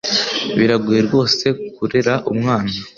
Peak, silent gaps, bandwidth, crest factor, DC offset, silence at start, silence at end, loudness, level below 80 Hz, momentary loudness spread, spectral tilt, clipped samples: 0 dBFS; none; 7.4 kHz; 16 dB; under 0.1%; 0.05 s; 0.1 s; -17 LUFS; -50 dBFS; 5 LU; -5 dB/octave; under 0.1%